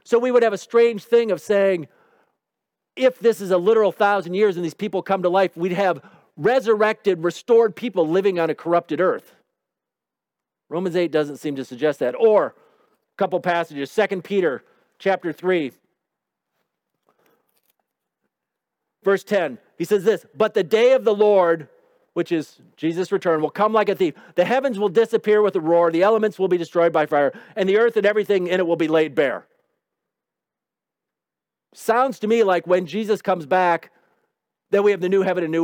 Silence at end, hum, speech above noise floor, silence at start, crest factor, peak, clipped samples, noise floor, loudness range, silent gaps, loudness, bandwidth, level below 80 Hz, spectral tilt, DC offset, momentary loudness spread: 0 s; none; 68 dB; 0.1 s; 16 dB; -4 dBFS; under 0.1%; -87 dBFS; 7 LU; none; -20 LUFS; 16.5 kHz; -76 dBFS; -6 dB/octave; under 0.1%; 9 LU